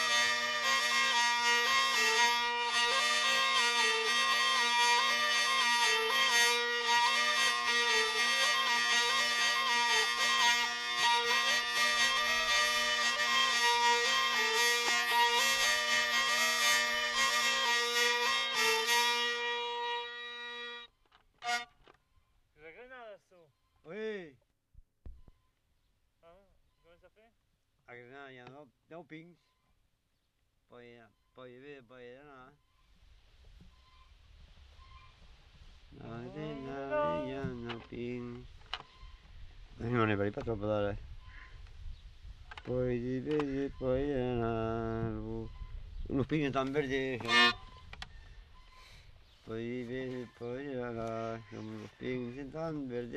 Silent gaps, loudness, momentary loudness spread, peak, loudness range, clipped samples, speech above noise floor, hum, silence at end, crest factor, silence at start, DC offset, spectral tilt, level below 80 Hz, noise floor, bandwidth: none; -29 LUFS; 18 LU; -14 dBFS; 16 LU; under 0.1%; 43 dB; none; 0 s; 20 dB; 0 s; under 0.1%; -2 dB/octave; -56 dBFS; -77 dBFS; 14 kHz